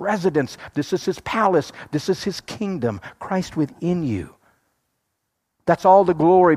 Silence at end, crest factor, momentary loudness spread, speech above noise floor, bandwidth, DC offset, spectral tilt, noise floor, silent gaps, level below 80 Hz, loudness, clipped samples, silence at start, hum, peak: 0 s; 18 dB; 14 LU; 57 dB; 14.5 kHz; under 0.1%; -6.5 dB/octave; -76 dBFS; none; -56 dBFS; -21 LUFS; under 0.1%; 0 s; none; -2 dBFS